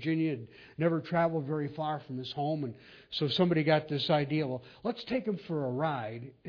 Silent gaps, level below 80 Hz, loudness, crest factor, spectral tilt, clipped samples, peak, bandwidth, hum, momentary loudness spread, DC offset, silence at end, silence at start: none; -68 dBFS; -32 LUFS; 20 dB; -8 dB/octave; under 0.1%; -12 dBFS; 5.4 kHz; none; 11 LU; under 0.1%; 0 s; 0 s